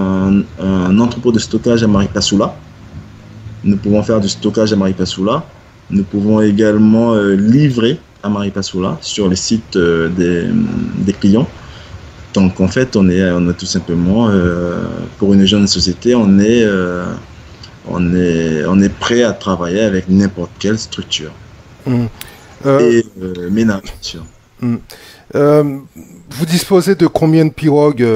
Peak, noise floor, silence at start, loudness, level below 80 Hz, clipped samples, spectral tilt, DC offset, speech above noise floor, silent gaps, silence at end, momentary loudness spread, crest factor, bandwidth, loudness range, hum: 0 dBFS; -35 dBFS; 0 s; -13 LUFS; -38 dBFS; under 0.1%; -6 dB/octave; under 0.1%; 23 dB; none; 0 s; 13 LU; 14 dB; 15.5 kHz; 4 LU; none